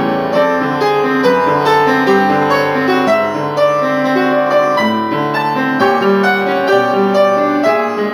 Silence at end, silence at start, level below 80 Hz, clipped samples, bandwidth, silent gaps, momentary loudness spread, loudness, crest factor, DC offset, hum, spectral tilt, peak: 0 s; 0 s; -60 dBFS; under 0.1%; over 20 kHz; none; 3 LU; -13 LUFS; 12 dB; under 0.1%; none; -6 dB/octave; 0 dBFS